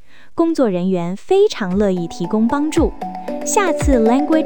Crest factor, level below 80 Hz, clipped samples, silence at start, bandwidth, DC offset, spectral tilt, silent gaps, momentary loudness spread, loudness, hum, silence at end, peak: 14 dB; -32 dBFS; under 0.1%; 0 s; 19 kHz; 3%; -5.5 dB/octave; none; 8 LU; -17 LUFS; none; 0 s; -2 dBFS